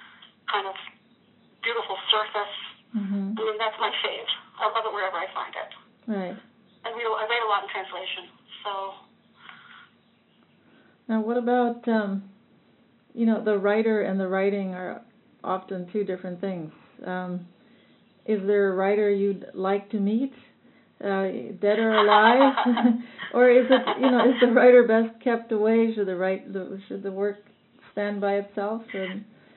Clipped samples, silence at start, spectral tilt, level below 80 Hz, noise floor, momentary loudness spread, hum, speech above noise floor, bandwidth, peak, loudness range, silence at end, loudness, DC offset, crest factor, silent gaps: under 0.1%; 0.5 s; -3 dB/octave; -84 dBFS; -62 dBFS; 18 LU; none; 38 dB; 4.2 kHz; -4 dBFS; 11 LU; 0.35 s; -24 LUFS; under 0.1%; 22 dB; none